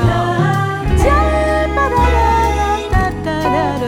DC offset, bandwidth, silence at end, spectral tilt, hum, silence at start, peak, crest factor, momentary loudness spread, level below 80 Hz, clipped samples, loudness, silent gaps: under 0.1%; 15.5 kHz; 0 s; -6.5 dB/octave; none; 0 s; 0 dBFS; 14 dB; 4 LU; -20 dBFS; under 0.1%; -15 LUFS; none